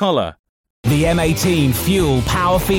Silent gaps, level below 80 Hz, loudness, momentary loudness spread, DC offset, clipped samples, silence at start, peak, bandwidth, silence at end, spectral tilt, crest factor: 0.39-0.64 s, 0.70-0.83 s; -30 dBFS; -16 LUFS; 5 LU; under 0.1%; under 0.1%; 0 s; -4 dBFS; 17 kHz; 0 s; -5.5 dB/octave; 12 dB